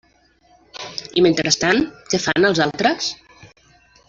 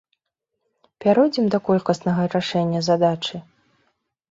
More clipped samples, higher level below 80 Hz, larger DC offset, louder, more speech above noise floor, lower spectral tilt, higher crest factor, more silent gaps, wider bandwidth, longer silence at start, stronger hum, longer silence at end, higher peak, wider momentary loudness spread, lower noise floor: neither; first, -52 dBFS vs -62 dBFS; neither; about the same, -18 LUFS vs -20 LUFS; second, 39 dB vs 60 dB; second, -3.5 dB/octave vs -6.5 dB/octave; about the same, 18 dB vs 18 dB; neither; about the same, 7.8 kHz vs 7.8 kHz; second, 0.75 s vs 1 s; neither; second, 0.65 s vs 0.9 s; about the same, -2 dBFS vs -4 dBFS; first, 16 LU vs 8 LU; second, -57 dBFS vs -79 dBFS